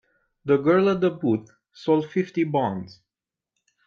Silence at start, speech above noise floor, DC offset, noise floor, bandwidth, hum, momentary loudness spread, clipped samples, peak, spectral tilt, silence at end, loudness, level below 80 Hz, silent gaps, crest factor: 0.45 s; 67 dB; under 0.1%; -89 dBFS; 6.8 kHz; none; 14 LU; under 0.1%; -8 dBFS; -8.5 dB/octave; 1 s; -23 LUFS; -66 dBFS; none; 16 dB